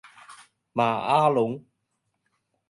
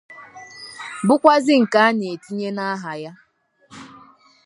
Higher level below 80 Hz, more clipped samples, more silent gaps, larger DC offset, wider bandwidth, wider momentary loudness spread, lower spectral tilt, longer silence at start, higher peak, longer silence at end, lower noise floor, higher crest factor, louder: about the same, -72 dBFS vs -70 dBFS; neither; neither; neither; about the same, 11.5 kHz vs 11.5 kHz; second, 12 LU vs 25 LU; first, -6.5 dB/octave vs -5 dB/octave; first, 0.3 s vs 0.1 s; second, -8 dBFS vs 0 dBFS; first, 1.1 s vs 0.6 s; first, -77 dBFS vs -53 dBFS; about the same, 20 dB vs 20 dB; second, -24 LUFS vs -18 LUFS